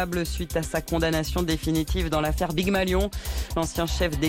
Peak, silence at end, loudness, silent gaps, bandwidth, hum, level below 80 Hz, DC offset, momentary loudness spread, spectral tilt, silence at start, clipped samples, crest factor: -12 dBFS; 0 s; -26 LUFS; none; 17 kHz; none; -32 dBFS; under 0.1%; 5 LU; -5 dB/octave; 0 s; under 0.1%; 12 dB